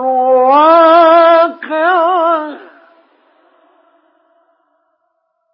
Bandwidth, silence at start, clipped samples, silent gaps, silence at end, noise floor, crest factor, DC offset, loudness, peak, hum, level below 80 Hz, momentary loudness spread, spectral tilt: 5.8 kHz; 0 s; under 0.1%; none; 2.95 s; -65 dBFS; 12 dB; under 0.1%; -9 LUFS; 0 dBFS; none; -66 dBFS; 9 LU; -7 dB/octave